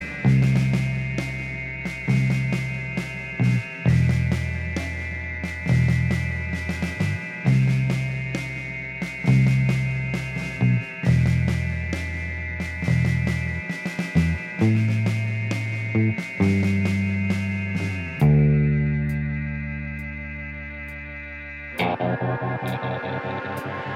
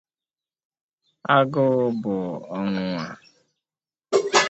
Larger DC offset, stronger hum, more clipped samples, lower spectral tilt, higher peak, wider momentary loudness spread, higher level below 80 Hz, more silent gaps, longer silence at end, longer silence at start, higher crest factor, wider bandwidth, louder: neither; neither; neither; first, -7.5 dB/octave vs -4.5 dB/octave; second, -8 dBFS vs -4 dBFS; about the same, 10 LU vs 11 LU; first, -38 dBFS vs -66 dBFS; neither; about the same, 0 s vs 0 s; second, 0 s vs 1.25 s; about the same, 16 dB vs 20 dB; first, 11.5 kHz vs 8.8 kHz; about the same, -24 LUFS vs -23 LUFS